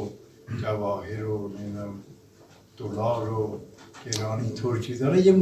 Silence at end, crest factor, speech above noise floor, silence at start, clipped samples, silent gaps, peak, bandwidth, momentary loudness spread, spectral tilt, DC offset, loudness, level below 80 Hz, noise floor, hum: 0 s; 20 dB; 28 dB; 0 s; under 0.1%; none; -8 dBFS; 14.5 kHz; 15 LU; -6.5 dB/octave; under 0.1%; -28 LUFS; -56 dBFS; -54 dBFS; none